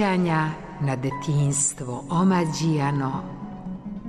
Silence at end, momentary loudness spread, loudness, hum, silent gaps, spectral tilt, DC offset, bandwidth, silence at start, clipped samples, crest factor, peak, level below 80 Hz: 0 s; 14 LU; -24 LUFS; none; none; -5.5 dB/octave; under 0.1%; 13 kHz; 0 s; under 0.1%; 14 dB; -10 dBFS; -50 dBFS